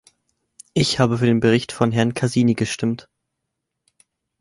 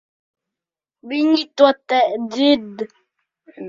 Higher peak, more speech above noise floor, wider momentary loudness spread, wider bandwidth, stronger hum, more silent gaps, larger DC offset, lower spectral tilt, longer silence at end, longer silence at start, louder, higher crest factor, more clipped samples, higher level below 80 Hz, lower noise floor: about the same, -2 dBFS vs 0 dBFS; second, 61 dB vs 70 dB; second, 7 LU vs 16 LU; first, 11.5 kHz vs 7.6 kHz; neither; neither; neither; about the same, -5.5 dB/octave vs -4.5 dB/octave; first, 1.45 s vs 0 s; second, 0.75 s vs 1.05 s; about the same, -19 LUFS vs -17 LUFS; about the same, 20 dB vs 20 dB; neither; first, -52 dBFS vs -66 dBFS; second, -79 dBFS vs -88 dBFS